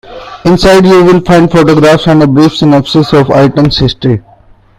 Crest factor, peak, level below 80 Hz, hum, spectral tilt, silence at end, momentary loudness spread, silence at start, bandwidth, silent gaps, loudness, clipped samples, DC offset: 6 dB; 0 dBFS; -28 dBFS; none; -6.5 dB/octave; 0.6 s; 8 LU; 0.1 s; 15 kHz; none; -6 LUFS; 3%; under 0.1%